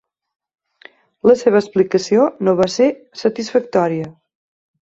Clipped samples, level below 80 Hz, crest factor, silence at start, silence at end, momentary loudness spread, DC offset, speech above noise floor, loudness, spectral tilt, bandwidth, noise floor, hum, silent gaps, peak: under 0.1%; -60 dBFS; 16 dB; 1.25 s; 0.8 s; 8 LU; under 0.1%; 31 dB; -16 LUFS; -6 dB/octave; 8 kHz; -47 dBFS; none; none; -2 dBFS